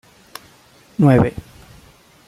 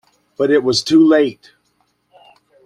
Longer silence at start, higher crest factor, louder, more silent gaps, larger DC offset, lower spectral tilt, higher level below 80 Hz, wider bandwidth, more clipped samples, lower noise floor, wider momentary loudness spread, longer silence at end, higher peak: first, 1 s vs 0.4 s; about the same, 18 dB vs 14 dB; about the same, -16 LUFS vs -14 LUFS; neither; neither; first, -8.5 dB/octave vs -4.5 dB/octave; first, -44 dBFS vs -60 dBFS; first, 14 kHz vs 10.5 kHz; neither; second, -50 dBFS vs -64 dBFS; first, 25 LU vs 9 LU; second, 0.85 s vs 1.3 s; about the same, -2 dBFS vs -2 dBFS